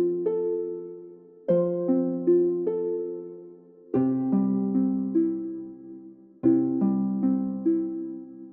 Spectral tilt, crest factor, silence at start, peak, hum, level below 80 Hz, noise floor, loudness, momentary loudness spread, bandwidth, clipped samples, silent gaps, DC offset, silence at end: -12.5 dB/octave; 16 dB; 0 s; -10 dBFS; none; -72 dBFS; -48 dBFS; -26 LUFS; 17 LU; 2.5 kHz; under 0.1%; none; under 0.1%; 0 s